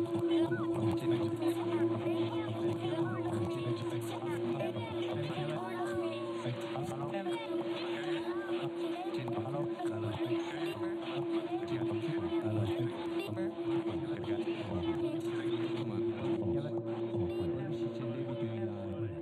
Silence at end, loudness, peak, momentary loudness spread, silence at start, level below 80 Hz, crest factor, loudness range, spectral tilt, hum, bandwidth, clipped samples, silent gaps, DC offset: 0 s; -36 LUFS; -22 dBFS; 5 LU; 0 s; -70 dBFS; 14 dB; 3 LU; -7.5 dB/octave; none; 12.5 kHz; under 0.1%; none; under 0.1%